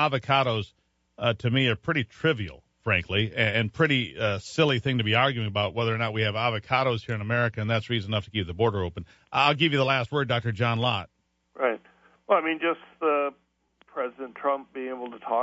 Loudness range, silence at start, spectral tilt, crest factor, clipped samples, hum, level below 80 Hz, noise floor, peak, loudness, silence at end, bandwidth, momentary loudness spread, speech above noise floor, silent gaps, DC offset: 4 LU; 0 s; -6.5 dB/octave; 22 dB; under 0.1%; none; -56 dBFS; -61 dBFS; -6 dBFS; -26 LUFS; 0 s; 8 kHz; 10 LU; 35 dB; none; under 0.1%